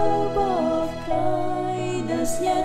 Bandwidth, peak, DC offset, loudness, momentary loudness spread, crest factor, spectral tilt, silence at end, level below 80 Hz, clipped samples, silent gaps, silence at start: 16 kHz; -10 dBFS; under 0.1%; -24 LUFS; 4 LU; 12 dB; -5.5 dB/octave; 0 s; -42 dBFS; under 0.1%; none; 0 s